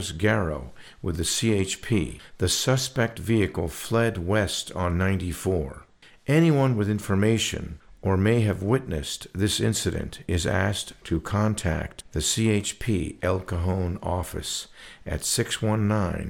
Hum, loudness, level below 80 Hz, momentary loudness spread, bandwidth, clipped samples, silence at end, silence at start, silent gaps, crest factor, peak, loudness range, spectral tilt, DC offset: none; -25 LUFS; -42 dBFS; 10 LU; 18.5 kHz; under 0.1%; 0 s; 0 s; none; 18 dB; -6 dBFS; 3 LU; -5 dB/octave; under 0.1%